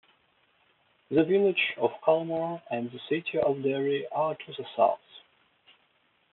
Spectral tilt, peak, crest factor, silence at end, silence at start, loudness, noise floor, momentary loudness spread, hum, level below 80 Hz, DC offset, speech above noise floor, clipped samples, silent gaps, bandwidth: -4 dB/octave; -10 dBFS; 20 dB; 1.15 s; 1.1 s; -28 LUFS; -69 dBFS; 10 LU; none; -74 dBFS; under 0.1%; 42 dB; under 0.1%; none; 4.2 kHz